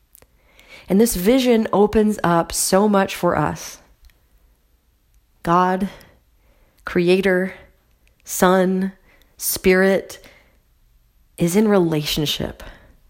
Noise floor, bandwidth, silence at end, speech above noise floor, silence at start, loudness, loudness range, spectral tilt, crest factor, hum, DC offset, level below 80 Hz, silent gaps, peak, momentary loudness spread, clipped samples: -60 dBFS; 16.5 kHz; 0.4 s; 42 dB; 0.7 s; -18 LUFS; 6 LU; -5 dB/octave; 20 dB; none; under 0.1%; -44 dBFS; none; 0 dBFS; 13 LU; under 0.1%